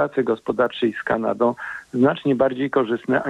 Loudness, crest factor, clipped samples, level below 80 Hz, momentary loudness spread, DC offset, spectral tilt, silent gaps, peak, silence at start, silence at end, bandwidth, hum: -21 LUFS; 16 dB; under 0.1%; -58 dBFS; 4 LU; under 0.1%; -7.5 dB/octave; none; -6 dBFS; 0 s; 0 s; 9.2 kHz; none